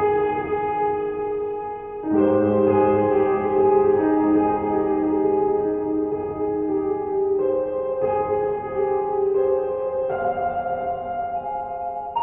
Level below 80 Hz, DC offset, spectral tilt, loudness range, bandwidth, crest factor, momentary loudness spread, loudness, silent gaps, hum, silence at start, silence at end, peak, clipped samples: -52 dBFS; under 0.1%; -7.5 dB/octave; 4 LU; 3.4 kHz; 14 dB; 9 LU; -22 LUFS; none; none; 0 s; 0 s; -6 dBFS; under 0.1%